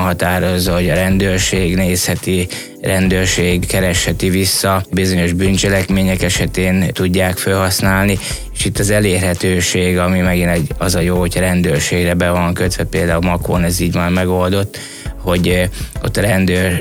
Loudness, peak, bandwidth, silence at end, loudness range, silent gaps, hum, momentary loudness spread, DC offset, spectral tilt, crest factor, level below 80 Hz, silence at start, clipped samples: -15 LUFS; 0 dBFS; 17 kHz; 0 s; 2 LU; none; none; 5 LU; 0.3%; -4.5 dB/octave; 14 dB; -28 dBFS; 0 s; under 0.1%